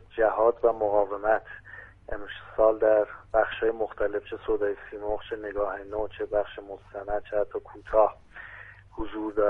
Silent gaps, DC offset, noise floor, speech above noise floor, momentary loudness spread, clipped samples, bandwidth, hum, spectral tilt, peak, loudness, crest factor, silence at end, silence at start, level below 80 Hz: none; under 0.1%; -47 dBFS; 20 dB; 20 LU; under 0.1%; 3.9 kHz; none; -7.5 dB/octave; -8 dBFS; -27 LUFS; 20 dB; 0 s; 0.15 s; -48 dBFS